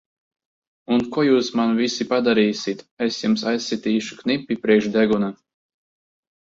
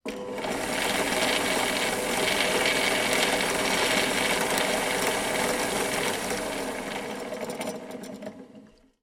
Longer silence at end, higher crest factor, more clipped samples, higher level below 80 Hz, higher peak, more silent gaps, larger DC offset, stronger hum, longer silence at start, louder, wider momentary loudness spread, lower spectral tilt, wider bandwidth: first, 1.15 s vs 0.35 s; about the same, 18 dB vs 20 dB; neither; second, -62 dBFS vs -54 dBFS; first, -4 dBFS vs -8 dBFS; first, 2.91-2.97 s vs none; neither; neither; first, 0.9 s vs 0.05 s; first, -21 LUFS vs -26 LUFS; second, 7 LU vs 11 LU; first, -5 dB/octave vs -2 dB/octave; second, 7.8 kHz vs 17 kHz